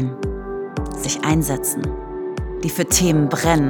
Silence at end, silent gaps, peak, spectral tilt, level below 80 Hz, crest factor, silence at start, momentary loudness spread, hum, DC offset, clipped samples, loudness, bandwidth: 0 s; none; 0 dBFS; -4.5 dB/octave; -34 dBFS; 20 dB; 0 s; 12 LU; none; under 0.1%; under 0.1%; -21 LUFS; over 20 kHz